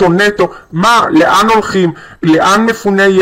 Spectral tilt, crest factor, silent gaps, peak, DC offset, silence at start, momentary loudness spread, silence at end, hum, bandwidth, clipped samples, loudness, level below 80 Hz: -5 dB/octave; 8 dB; none; 0 dBFS; under 0.1%; 0 s; 8 LU; 0 s; none; 16.5 kHz; under 0.1%; -10 LUFS; -42 dBFS